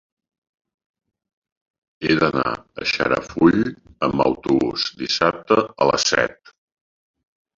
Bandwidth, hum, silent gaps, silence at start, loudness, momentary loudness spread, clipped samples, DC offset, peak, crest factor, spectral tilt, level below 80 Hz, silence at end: 7.6 kHz; none; none; 2 s; -20 LUFS; 8 LU; under 0.1%; under 0.1%; -2 dBFS; 20 dB; -4 dB/octave; -52 dBFS; 1.25 s